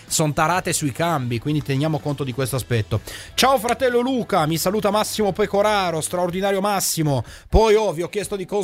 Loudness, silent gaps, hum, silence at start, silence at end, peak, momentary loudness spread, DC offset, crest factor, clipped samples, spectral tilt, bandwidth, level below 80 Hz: -21 LUFS; none; none; 0.1 s; 0 s; -2 dBFS; 7 LU; under 0.1%; 18 dB; under 0.1%; -4.5 dB/octave; 16 kHz; -36 dBFS